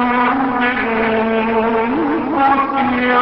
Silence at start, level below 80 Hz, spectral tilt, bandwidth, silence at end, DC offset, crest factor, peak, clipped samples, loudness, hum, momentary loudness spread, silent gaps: 0 s; -44 dBFS; -10.5 dB/octave; 5.8 kHz; 0 s; under 0.1%; 12 dB; -2 dBFS; under 0.1%; -15 LUFS; none; 3 LU; none